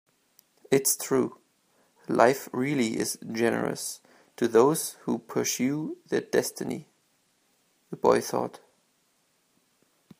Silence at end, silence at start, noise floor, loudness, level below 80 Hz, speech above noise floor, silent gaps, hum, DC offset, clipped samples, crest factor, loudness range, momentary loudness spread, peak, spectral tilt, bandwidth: 1.65 s; 0.7 s; -70 dBFS; -27 LUFS; -72 dBFS; 44 dB; none; none; under 0.1%; under 0.1%; 24 dB; 6 LU; 13 LU; -4 dBFS; -4 dB/octave; 15.5 kHz